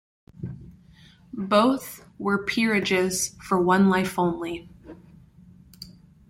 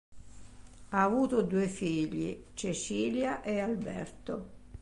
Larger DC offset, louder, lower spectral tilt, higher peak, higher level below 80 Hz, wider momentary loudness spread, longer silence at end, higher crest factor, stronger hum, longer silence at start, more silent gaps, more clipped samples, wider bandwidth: neither; first, -23 LUFS vs -33 LUFS; about the same, -4.5 dB/octave vs -5.5 dB/octave; first, -6 dBFS vs -16 dBFS; about the same, -56 dBFS vs -56 dBFS; first, 23 LU vs 12 LU; first, 0.4 s vs 0.05 s; about the same, 20 dB vs 18 dB; neither; first, 0.4 s vs 0.1 s; neither; neither; first, 16.5 kHz vs 11.5 kHz